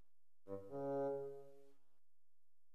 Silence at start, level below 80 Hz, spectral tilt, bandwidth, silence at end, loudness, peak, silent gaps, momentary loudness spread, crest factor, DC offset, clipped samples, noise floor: 0.45 s; under -90 dBFS; -9 dB/octave; 9.4 kHz; 1.05 s; -46 LUFS; -34 dBFS; none; 15 LU; 16 dB; 0.2%; under 0.1%; under -90 dBFS